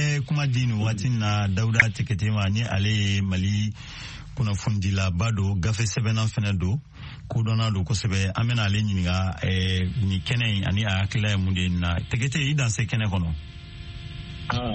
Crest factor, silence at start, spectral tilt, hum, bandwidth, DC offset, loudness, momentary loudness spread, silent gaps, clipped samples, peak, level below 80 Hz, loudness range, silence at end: 24 dB; 0 s; -5 dB/octave; none; 8.6 kHz; under 0.1%; -24 LUFS; 11 LU; none; under 0.1%; 0 dBFS; -42 dBFS; 2 LU; 0 s